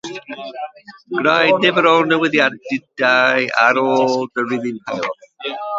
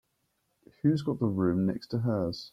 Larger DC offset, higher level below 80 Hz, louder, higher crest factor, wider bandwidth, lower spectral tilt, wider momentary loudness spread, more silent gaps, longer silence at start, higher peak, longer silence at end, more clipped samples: neither; about the same, -64 dBFS vs -62 dBFS; first, -16 LUFS vs -29 LUFS; about the same, 18 dB vs 16 dB; second, 7.8 kHz vs 9.8 kHz; second, -4.5 dB/octave vs -8.5 dB/octave; first, 16 LU vs 4 LU; neither; second, 0.05 s vs 0.85 s; first, 0 dBFS vs -14 dBFS; about the same, 0 s vs 0.05 s; neither